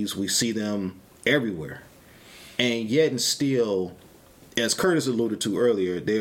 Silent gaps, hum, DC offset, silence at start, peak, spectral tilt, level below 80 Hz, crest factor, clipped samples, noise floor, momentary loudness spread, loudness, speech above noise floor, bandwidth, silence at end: none; none; under 0.1%; 0 s; -6 dBFS; -3.5 dB/octave; -60 dBFS; 20 dB; under 0.1%; -51 dBFS; 10 LU; -24 LUFS; 27 dB; 17 kHz; 0 s